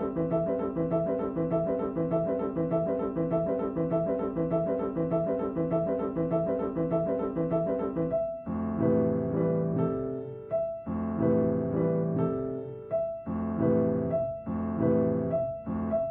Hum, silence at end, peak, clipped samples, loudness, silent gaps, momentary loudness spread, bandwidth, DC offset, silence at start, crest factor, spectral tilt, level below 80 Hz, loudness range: none; 0 s; -14 dBFS; under 0.1%; -29 LUFS; none; 6 LU; 3.6 kHz; under 0.1%; 0 s; 14 dB; -13 dB/octave; -54 dBFS; 1 LU